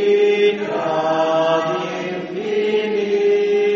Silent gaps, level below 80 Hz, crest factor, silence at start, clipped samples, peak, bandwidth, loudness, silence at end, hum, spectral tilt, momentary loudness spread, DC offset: none; -64 dBFS; 12 dB; 0 s; under 0.1%; -6 dBFS; 7.2 kHz; -18 LUFS; 0 s; none; -3 dB/octave; 8 LU; under 0.1%